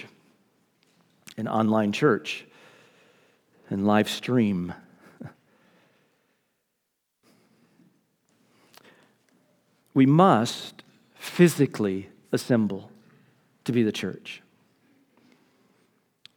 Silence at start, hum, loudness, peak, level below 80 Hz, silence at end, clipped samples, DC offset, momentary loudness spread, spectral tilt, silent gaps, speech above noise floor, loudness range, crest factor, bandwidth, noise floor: 0 s; none; -24 LUFS; -4 dBFS; -74 dBFS; 2 s; under 0.1%; under 0.1%; 23 LU; -6.5 dB/octave; none; 56 dB; 9 LU; 24 dB; 20 kHz; -79 dBFS